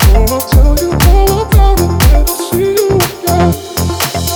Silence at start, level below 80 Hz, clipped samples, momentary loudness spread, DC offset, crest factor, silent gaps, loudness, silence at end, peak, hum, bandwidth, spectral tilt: 0 s; -12 dBFS; under 0.1%; 5 LU; under 0.1%; 8 dB; none; -11 LUFS; 0 s; 0 dBFS; none; over 20 kHz; -5 dB/octave